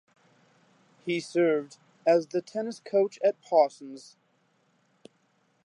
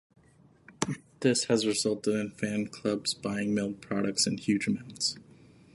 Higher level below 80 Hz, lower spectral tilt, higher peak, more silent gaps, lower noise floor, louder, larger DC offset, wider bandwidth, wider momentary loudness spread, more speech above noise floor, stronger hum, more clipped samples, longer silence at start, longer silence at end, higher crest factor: second, -88 dBFS vs -66 dBFS; first, -5.5 dB/octave vs -4 dB/octave; about the same, -10 dBFS vs -8 dBFS; neither; first, -69 dBFS vs -60 dBFS; first, -27 LUFS vs -30 LUFS; neither; about the same, 11 kHz vs 12 kHz; first, 19 LU vs 7 LU; first, 43 dB vs 31 dB; neither; neither; first, 1.05 s vs 0.7 s; first, 1.65 s vs 0.5 s; about the same, 20 dB vs 22 dB